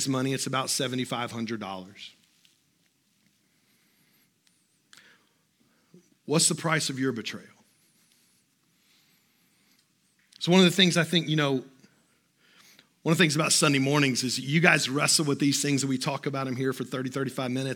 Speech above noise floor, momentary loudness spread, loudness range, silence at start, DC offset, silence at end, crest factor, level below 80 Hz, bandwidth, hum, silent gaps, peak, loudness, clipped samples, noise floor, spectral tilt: 44 dB; 14 LU; 14 LU; 0 s; under 0.1%; 0 s; 26 dB; -82 dBFS; 17.5 kHz; none; none; -2 dBFS; -25 LUFS; under 0.1%; -69 dBFS; -3.5 dB/octave